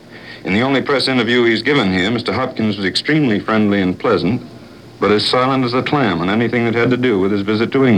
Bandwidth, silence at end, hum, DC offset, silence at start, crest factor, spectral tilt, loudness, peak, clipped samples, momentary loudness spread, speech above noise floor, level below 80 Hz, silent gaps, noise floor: 10.5 kHz; 0 s; none; 0.2%; 0.05 s; 14 dB; -6 dB/octave; -15 LUFS; 0 dBFS; under 0.1%; 5 LU; 21 dB; -52 dBFS; none; -36 dBFS